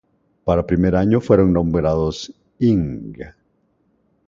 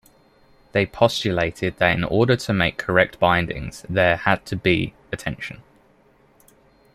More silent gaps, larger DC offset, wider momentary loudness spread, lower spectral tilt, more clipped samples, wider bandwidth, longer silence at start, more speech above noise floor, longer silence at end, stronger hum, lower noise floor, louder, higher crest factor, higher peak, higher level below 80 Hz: neither; neither; first, 19 LU vs 11 LU; first, -8 dB/octave vs -5.5 dB/octave; neither; second, 7.6 kHz vs 15 kHz; second, 0.45 s vs 0.75 s; first, 46 dB vs 36 dB; second, 1 s vs 1.4 s; neither; first, -64 dBFS vs -56 dBFS; first, -18 LUFS vs -21 LUFS; about the same, 18 dB vs 20 dB; about the same, 0 dBFS vs -2 dBFS; first, -36 dBFS vs -46 dBFS